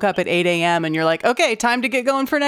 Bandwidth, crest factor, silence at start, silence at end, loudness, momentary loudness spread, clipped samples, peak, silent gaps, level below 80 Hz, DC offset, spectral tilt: 16 kHz; 12 dB; 0 s; 0 s; -18 LUFS; 2 LU; under 0.1%; -6 dBFS; none; -60 dBFS; under 0.1%; -4 dB/octave